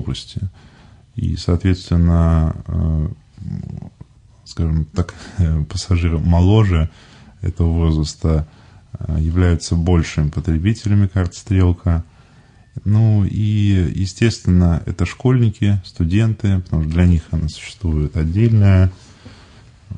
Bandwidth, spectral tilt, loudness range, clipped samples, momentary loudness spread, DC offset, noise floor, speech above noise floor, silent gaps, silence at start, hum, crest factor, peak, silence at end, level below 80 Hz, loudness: 9.6 kHz; -7.5 dB/octave; 3 LU; under 0.1%; 13 LU; under 0.1%; -47 dBFS; 31 dB; none; 0 s; none; 14 dB; -2 dBFS; 0 s; -30 dBFS; -18 LUFS